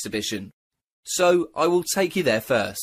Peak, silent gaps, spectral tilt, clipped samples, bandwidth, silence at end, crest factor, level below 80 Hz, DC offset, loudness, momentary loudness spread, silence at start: -8 dBFS; 0.54-0.71 s, 0.84-1.03 s; -3.5 dB/octave; under 0.1%; 15.5 kHz; 0 s; 16 dB; -60 dBFS; under 0.1%; -22 LUFS; 10 LU; 0 s